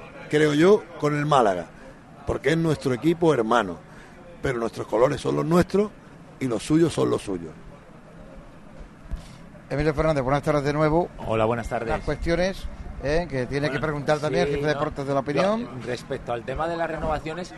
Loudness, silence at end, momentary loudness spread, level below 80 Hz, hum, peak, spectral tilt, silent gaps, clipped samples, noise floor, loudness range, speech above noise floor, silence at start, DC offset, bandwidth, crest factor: -24 LUFS; 0 s; 12 LU; -42 dBFS; none; -4 dBFS; -6.5 dB/octave; none; under 0.1%; -45 dBFS; 5 LU; 22 dB; 0 s; under 0.1%; 12.5 kHz; 20 dB